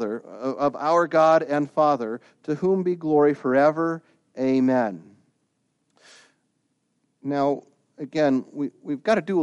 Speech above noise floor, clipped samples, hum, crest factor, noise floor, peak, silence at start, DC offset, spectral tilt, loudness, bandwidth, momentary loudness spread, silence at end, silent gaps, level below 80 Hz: 50 dB; under 0.1%; none; 16 dB; -72 dBFS; -6 dBFS; 0 s; under 0.1%; -7 dB/octave; -23 LUFS; 9.4 kHz; 13 LU; 0 s; none; -74 dBFS